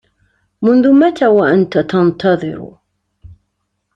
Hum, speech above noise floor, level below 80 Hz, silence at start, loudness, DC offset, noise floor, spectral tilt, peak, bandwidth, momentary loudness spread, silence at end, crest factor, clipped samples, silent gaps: none; 58 dB; -52 dBFS; 0.6 s; -12 LUFS; under 0.1%; -69 dBFS; -8 dB/octave; -2 dBFS; 7.4 kHz; 9 LU; 0.65 s; 12 dB; under 0.1%; none